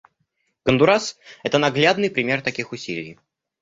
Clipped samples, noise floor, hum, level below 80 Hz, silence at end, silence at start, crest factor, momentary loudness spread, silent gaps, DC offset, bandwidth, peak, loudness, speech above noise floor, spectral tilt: under 0.1%; -72 dBFS; none; -56 dBFS; 0.5 s; 0.65 s; 20 dB; 14 LU; none; under 0.1%; 8 kHz; 0 dBFS; -20 LUFS; 51 dB; -4.5 dB/octave